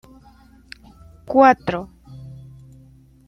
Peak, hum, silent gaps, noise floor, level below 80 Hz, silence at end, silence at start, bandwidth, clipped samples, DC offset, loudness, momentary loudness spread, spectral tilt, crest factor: -2 dBFS; none; none; -49 dBFS; -52 dBFS; 1 s; 1.3 s; 10 kHz; under 0.1%; under 0.1%; -17 LUFS; 28 LU; -7 dB/octave; 20 dB